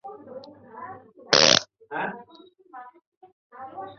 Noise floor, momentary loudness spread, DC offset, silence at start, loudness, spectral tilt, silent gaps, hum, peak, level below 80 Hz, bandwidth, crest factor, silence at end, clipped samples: -53 dBFS; 29 LU; under 0.1%; 0.05 s; -20 LUFS; -1 dB/octave; 3.07-3.21 s, 3.33-3.50 s; none; 0 dBFS; -66 dBFS; 7.6 kHz; 26 dB; 0.05 s; under 0.1%